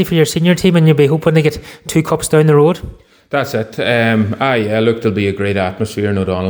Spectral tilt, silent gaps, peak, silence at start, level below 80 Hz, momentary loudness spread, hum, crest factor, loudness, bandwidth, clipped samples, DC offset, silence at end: -6 dB/octave; none; 0 dBFS; 0 s; -42 dBFS; 8 LU; none; 12 dB; -14 LUFS; over 20 kHz; under 0.1%; under 0.1%; 0 s